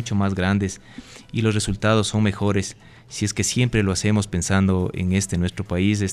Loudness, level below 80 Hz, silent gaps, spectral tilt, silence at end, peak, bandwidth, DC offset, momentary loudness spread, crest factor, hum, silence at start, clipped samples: -22 LUFS; -42 dBFS; none; -5 dB/octave; 0 s; -6 dBFS; 14 kHz; under 0.1%; 10 LU; 16 dB; none; 0 s; under 0.1%